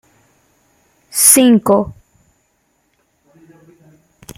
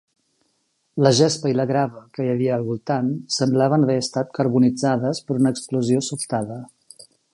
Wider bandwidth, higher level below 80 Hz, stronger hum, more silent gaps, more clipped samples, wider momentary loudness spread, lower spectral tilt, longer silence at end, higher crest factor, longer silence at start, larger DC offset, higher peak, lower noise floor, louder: first, 16.5 kHz vs 11.5 kHz; first, -52 dBFS vs -64 dBFS; neither; neither; neither; first, 15 LU vs 8 LU; second, -3 dB/octave vs -5.5 dB/octave; first, 2.45 s vs 0.7 s; about the same, 18 dB vs 20 dB; first, 1.15 s vs 0.95 s; neither; about the same, 0 dBFS vs -2 dBFS; second, -63 dBFS vs -69 dBFS; first, -10 LUFS vs -21 LUFS